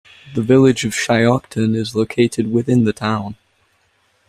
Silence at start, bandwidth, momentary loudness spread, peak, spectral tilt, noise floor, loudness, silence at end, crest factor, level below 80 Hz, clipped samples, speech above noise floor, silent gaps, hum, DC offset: 0.25 s; 14.5 kHz; 10 LU; -2 dBFS; -6 dB/octave; -61 dBFS; -17 LUFS; 0.95 s; 16 dB; -52 dBFS; under 0.1%; 45 dB; none; none; under 0.1%